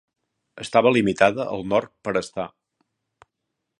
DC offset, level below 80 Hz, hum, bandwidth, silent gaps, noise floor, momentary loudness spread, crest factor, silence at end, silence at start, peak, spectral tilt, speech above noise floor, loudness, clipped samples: under 0.1%; -58 dBFS; none; 11.5 kHz; none; -80 dBFS; 15 LU; 24 dB; 1.35 s; 0.55 s; 0 dBFS; -5.5 dB/octave; 59 dB; -22 LUFS; under 0.1%